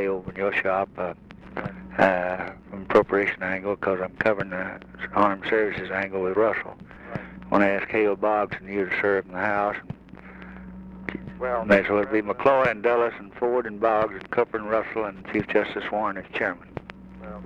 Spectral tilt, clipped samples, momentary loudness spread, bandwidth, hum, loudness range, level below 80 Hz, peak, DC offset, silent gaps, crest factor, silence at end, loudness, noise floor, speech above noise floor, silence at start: -7.5 dB/octave; under 0.1%; 18 LU; 8.6 kHz; none; 3 LU; -52 dBFS; -6 dBFS; under 0.1%; none; 18 dB; 0 s; -25 LUFS; -44 dBFS; 20 dB; 0 s